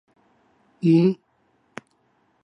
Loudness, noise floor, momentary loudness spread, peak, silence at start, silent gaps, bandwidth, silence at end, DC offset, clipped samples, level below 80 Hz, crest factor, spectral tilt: -20 LUFS; -66 dBFS; 25 LU; -8 dBFS; 0.85 s; none; 8.4 kHz; 1.3 s; under 0.1%; under 0.1%; -74 dBFS; 18 dB; -9 dB/octave